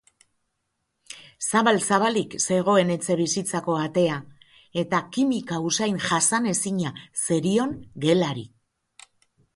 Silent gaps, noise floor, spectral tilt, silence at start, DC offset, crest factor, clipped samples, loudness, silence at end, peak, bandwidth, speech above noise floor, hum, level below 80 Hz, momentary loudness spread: none; -77 dBFS; -4 dB/octave; 1.1 s; under 0.1%; 20 dB; under 0.1%; -23 LUFS; 1.1 s; -6 dBFS; 12 kHz; 54 dB; none; -64 dBFS; 10 LU